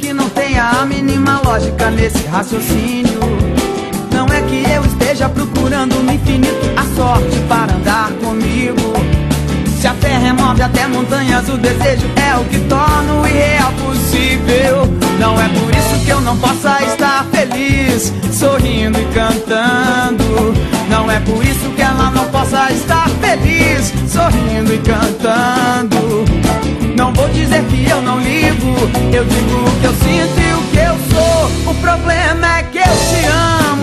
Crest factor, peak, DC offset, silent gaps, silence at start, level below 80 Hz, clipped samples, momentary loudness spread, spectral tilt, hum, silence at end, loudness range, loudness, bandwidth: 10 dB; 0 dBFS; under 0.1%; none; 0 s; -22 dBFS; under 0.1%; 3 LU; -5 dB/octave; none; 0 s; 2 LU; -12 LUFS; 13.5 kHz